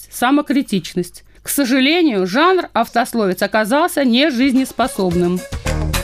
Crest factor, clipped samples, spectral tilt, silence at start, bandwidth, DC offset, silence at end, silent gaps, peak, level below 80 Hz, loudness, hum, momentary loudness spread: 14 dB; under 0.1%; -4.5 dB/octave; 0 s; 15.5 kHz; under 0.1%; 0 s; none; -2 dBFS; -34 dBFS; -16 LUFS; none; 8 LU